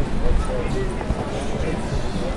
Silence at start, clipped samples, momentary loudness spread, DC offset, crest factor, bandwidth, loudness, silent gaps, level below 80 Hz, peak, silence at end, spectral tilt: 0 s; under 0.1%; 2 LU; under 0.1%; 14 dB; 11.5 kHz; -25 LUFS; none; -24 dBFS; -8 dBFS; 0 s; -6.5 dB/octave